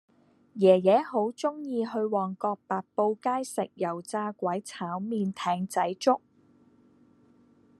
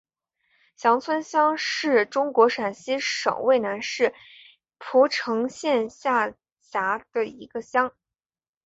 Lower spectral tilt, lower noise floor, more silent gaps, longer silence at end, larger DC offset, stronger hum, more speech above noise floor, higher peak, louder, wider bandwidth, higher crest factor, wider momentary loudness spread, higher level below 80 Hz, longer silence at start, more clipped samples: first, -6 dB/octave vs -3 dB/octave; second, -61 dBFS vs under -90 dBFS; second, none vs 6.52-6.56 s; first, 1.6 s vs 0.75 s; neither; neither; second, 34 dB vs over 67 dB; second, -8 dBFS vs -4 dBFS; second, -28 LUFS vs -24 LUFS; first, 13 kHz vs 8 kHz; about the same, 22 dB vs 20 dB; about the same, 11 LU vs 9 LU; second, -78 dBFS vs -72 dBFS; second, 0.55 s vs 0.8 s; neither